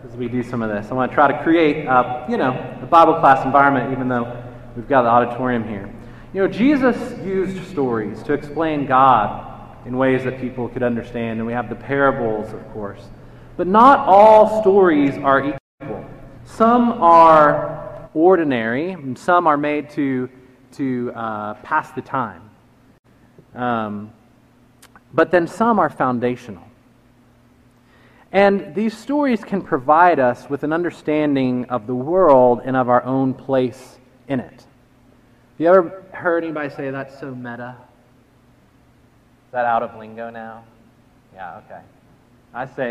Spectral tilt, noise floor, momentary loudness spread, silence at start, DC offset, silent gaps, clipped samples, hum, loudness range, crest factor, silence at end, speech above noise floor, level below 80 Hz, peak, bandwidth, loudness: -7.5 dB/octave; -53 dBFS; 19 LU; 0.05 s; under 0.1%; 15.60-15.78 s, 22.99-23.03 s; under 0.1%; none; 13 LU; 18 dB; 0 s; 36 dB; -48 dBFS; 0 dBFS; 12 kHz; -17 LUFS